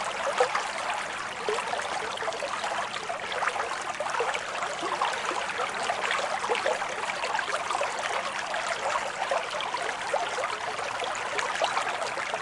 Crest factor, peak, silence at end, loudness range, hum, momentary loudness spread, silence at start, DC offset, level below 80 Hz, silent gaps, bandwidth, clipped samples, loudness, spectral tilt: 22 dB; -8 dBFS; 0 s; 2 LU; none; 4 LU; 0 s; under 0.1%; -66 dBFS; none; 11.5 kHz; under 0.1%; -29 LUFS; -1 dB/octave